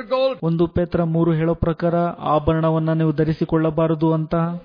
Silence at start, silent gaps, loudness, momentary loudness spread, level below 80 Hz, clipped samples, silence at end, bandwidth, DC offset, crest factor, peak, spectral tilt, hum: 0 s; none; -20 LUFS; 2 LU; -40 dBFS; under 0.1%; 0 s; 5.2 kHz; under 0.1%; 14 dB; -6 dBFS; -11 dB/octave; none